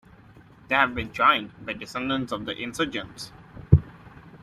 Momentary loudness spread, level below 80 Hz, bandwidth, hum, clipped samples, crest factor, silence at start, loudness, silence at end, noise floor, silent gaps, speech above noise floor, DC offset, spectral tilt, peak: 19 LU; -42 dBFS; 14 kHz; none; under 0.1%; 24 dB; 0.7 s; -25 LUFS; 0 s; -51 dBFS; none; 25 dB; under 0.1%; -6 dB/octave; -2 dBFS